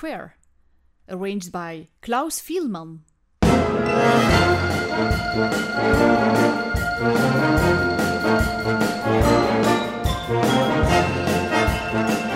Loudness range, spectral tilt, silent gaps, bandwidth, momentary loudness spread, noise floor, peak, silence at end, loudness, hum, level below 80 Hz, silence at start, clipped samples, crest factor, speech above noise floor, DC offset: 5 LU; -5.5 dB/octave; none; 16 kHz; 12 LU; -58 dBFS; -2 dBFS; 0 s; -20 LUFS; none; -34 dBFS; 0 s; under 0.1%; 18 dB; 38 dB; under 0.1%